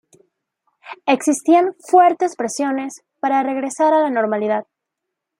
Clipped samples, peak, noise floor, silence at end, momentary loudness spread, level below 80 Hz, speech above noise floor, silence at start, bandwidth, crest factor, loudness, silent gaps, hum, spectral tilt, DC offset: under 0.1%; -2 dBFS; -80 dBFS; 0.75 s; 11 LU; -74 dBFS; 64 dB; 0.85 s; 15.5 kHz; 16 dB; -18 LUFS; none; none; -4 dB/octave; under 0.1%